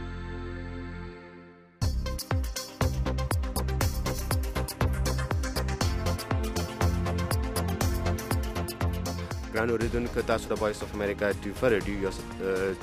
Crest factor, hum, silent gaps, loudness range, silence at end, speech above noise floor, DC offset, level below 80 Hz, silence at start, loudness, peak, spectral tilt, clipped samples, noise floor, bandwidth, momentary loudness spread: 18 dB; none; none; 2 LU; 0 s; 22 dB; under 0.1%; -36 dBFS; 0 s; -30 LUFS; -12 dBFS; -5.5 dB/octave; under 0.1%; -50 dBFS; 15.5 kHz; 10 LU